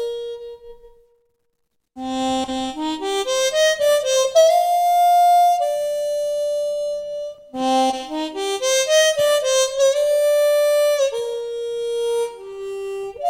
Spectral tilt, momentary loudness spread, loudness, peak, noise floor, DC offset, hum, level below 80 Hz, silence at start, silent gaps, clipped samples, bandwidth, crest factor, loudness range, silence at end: -1 dB/octave; 14 LU; -19 LUFS; -4 dBFS; -73 dBFS; under 0.1%; none; -58 dBFS; 0 s; none; under 0.1%; 16.5 kHz; 16 dB; 6 LU; 0 s